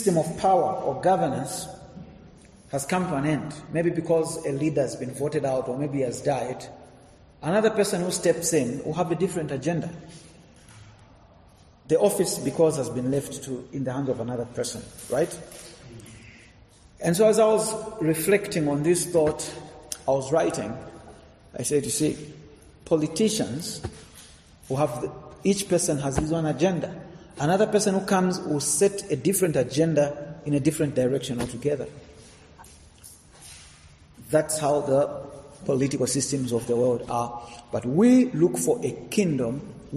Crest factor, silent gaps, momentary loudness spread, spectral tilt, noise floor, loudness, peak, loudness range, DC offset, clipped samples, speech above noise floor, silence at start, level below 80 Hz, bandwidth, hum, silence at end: 18 dB; none; 16 LU; -5 dB/octave; -53 dBFS; -25 LUFS; -8 dBFS; 6 LU; under 0.1%; under 0.1%; 29 dB; 0 s; -54 dBFS; 13.5 kHz; none; 0 s